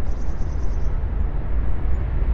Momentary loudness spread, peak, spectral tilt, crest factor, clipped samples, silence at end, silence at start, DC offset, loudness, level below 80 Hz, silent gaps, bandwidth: 3 LU; -10 dBFS; -8.5 dB/octave; 10 dB; under 0.1%; 0 s; 0 s; under 0.1%; -27 LUFS; -22 dBFS; none; 6.6 kHz